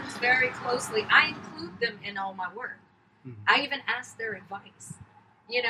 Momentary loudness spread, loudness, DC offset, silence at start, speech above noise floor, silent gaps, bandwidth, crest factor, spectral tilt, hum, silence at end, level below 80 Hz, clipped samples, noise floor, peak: 22 LU; -26 LUFS; under 0.1%; 0 s; 21 dB; none; 15.5 kHz; 24 dB; -2.5 dB/octave; none; 0 s; -70 dBFS; under 0.1%; -49 dBFS; -6 dBFS